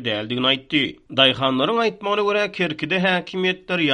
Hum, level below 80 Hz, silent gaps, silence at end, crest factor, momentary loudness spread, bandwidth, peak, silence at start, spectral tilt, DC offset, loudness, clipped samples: none; -58 dBFS; none; 0 s; 20 dB; 6 LU; 9.8 kHz; 0 dBFS; 0 s; -5.5 dB/octave; under 0.1%; -20 LUFS; under 0.1%